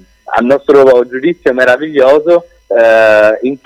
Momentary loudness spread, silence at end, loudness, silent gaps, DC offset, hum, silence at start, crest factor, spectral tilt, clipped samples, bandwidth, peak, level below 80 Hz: 8 LU; 0.1 s; -9 LUFS; none; under 0.1%; none; 0.3 s; 8 dB; -5.5 dB/octave; under 0.1%; 10.5 kHz; 0 dBFS; -48 dBFS